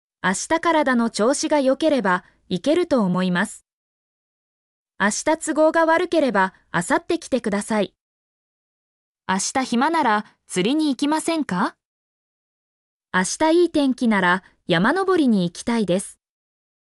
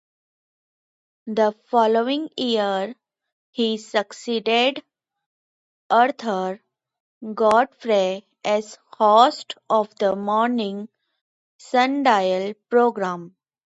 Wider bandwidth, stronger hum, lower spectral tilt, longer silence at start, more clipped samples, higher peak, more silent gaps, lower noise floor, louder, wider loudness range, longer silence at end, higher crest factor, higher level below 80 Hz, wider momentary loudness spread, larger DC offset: first, 12 kHz vs 10.5 kHz; neither; about the same, -4.5 dB/octave vs -4.5 dB/octave; second, 0.25 s vs 1.25 s; neither; second, -6 dBFS vs -2 dBFS; first, 3.73-4.86 s, 8.00-9.15 s, 11.85-13.00 s vs 3.33-3.53 s, 5.26-5.90 s, 7.00-7.21 s, 11.21-11.59 s; about the same, under -90 dBFS vs under -90 dBFS; about the same, -20 LUFS vs -21 LUFS; about the same, 4 LU vs 3 LU; first, 0.85 s vs 0.4 s; second, 14 dB vs 20 dB; first, -60 dBFS vs -72 dBFS; second, 7 LU vs 15 LU; neither